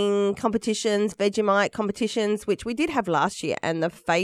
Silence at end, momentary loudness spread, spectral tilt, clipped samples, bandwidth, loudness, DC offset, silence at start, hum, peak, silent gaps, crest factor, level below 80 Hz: 0 s; 5 LU; -4.5 dB/octave; under 0.1%; 14 kHz; -24 LUFS; under 0.1%; 0 s; none; -8 dBFS; none; 16 dB; -58 dBFS